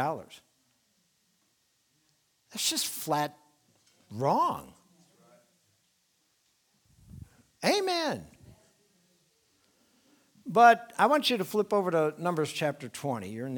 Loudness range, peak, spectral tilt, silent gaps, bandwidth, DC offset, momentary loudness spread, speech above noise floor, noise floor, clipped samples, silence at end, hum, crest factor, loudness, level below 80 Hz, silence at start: 9 LU; -6 dBFS; -3.5 dB/octave; none; 19.5 kHz; under 0.1%; 19 LU; 45 dB; -73 dBFS; under 0.1%; 0 s; none; 24 dB; -28 LUFS; -70 dBFS; 0 s